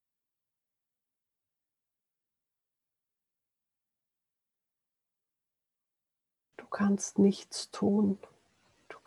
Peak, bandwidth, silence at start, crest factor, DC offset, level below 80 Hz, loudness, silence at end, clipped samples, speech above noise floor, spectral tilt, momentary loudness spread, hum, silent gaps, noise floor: -14 dBFS; 11.5 kHz; 6.6 s; 22 dB; under 0.1%; -80 dBFS; -30 LUFS; 0.1 s; under 0.1%; 60 dB; -6 dB/octave; 12 LU; none; none; -89 dBFS